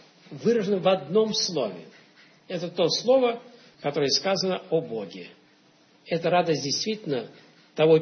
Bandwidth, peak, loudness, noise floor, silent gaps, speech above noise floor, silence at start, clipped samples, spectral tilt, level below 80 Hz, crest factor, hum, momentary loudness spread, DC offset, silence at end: 6.6 kHz; -8 dBFS; -25 LUFS; -59 dBFS; none; 34 dB; 0.3 s; under 0.1%; -4.5 dB/octave; -74 dBFS; 18 dB; none; 17 LU; under 0.1%; 0 s